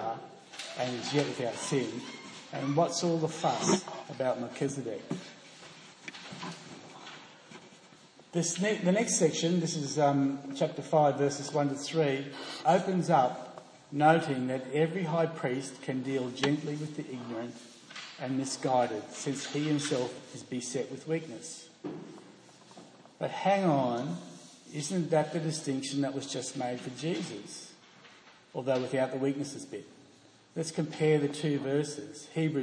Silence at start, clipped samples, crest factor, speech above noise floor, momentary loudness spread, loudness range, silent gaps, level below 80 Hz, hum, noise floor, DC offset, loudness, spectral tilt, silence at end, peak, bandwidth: 0 s; under 0.1%; 20 dB; 28 dB; 18 LU; 8 LU; none; -80 dBFS; none; -59 dBFS; under 0.1%; -31 LUFS; -5 dB/octave; 0 s; -12 dBFS; 10.5 kHz